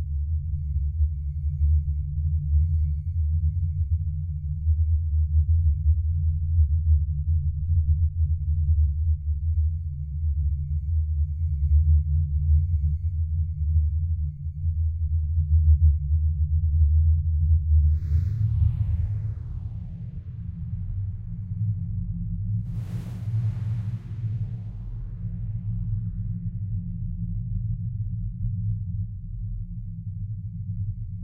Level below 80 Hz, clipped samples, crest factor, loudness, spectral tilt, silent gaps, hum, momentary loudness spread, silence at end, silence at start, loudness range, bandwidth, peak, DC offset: -26 dBFS; under 0.1%; 14 dB; -26 LUFS; -11.5 dB/octave; none; none; 12 LU; 0 s; 0 s; 8 LU; 0.6 kHz; -10 dBFS; under 0.1%